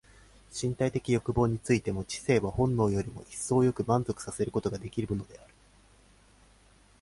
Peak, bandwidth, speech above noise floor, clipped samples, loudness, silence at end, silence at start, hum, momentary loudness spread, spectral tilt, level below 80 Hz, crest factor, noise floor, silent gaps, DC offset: -12 dBFS; 11.5 kHz; 31 dB; under 0.1%; -30 LUFS; 1.65 s; 0.5 s; none; 9 LU; -6.5 dB/octave; -50 dBFS; 18 dB; -60 dBFS; none; under 0.1%